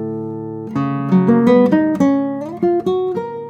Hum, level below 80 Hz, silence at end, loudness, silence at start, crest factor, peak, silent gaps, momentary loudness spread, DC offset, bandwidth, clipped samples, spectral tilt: none; -60 dBFS; 0 s; -16 LUFS; 0 s; 14 dB; 0 dBFS; none; 13 LU; under 0.1%; 7.8 kHz; under 0.1%; -9 dB/octave